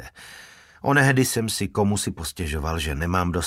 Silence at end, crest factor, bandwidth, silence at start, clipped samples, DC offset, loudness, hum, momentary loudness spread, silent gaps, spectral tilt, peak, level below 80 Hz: 0 s; 20 dB; 16 kHz; 0 s; under 0.1%; under 0.1%; -23 LUFS; none; 23 LU; none; -4.5 dB/octave; -4 dBFS; -38 dBFS